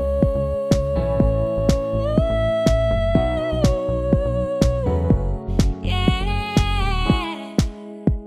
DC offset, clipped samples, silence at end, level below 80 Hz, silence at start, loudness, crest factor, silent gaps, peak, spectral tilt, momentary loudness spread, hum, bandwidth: under 0.1%; under 0.1%; 0 s; -24 dBFS; 0 s; -21 LUFS; 16 dB; none; -4 dBFS; -7 dB/octave; 4 LU; none; 13.5 kHz